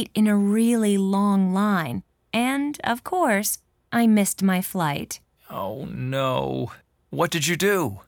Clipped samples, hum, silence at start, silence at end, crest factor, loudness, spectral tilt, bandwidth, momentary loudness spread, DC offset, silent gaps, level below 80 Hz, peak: under 0.1%; none; 0 s; 0.1 s; 16 dB; -23 LUFS; -5 dB/octave; 19 kHz; 12 LU; under 0.1%; none; -58 dBFS; -8 dBFS